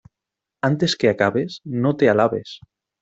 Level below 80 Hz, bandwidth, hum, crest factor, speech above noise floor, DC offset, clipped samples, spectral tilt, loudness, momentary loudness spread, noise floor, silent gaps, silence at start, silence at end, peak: -60 dBFS; 8 kHz; none; 18 dB; 66 dB; under 0.1%; under 0.1%; -6 dB/octave; -20 LUFS; 12 LU; -85 dBFS; none; 0.65 s; 0.45 s; -4 dBFS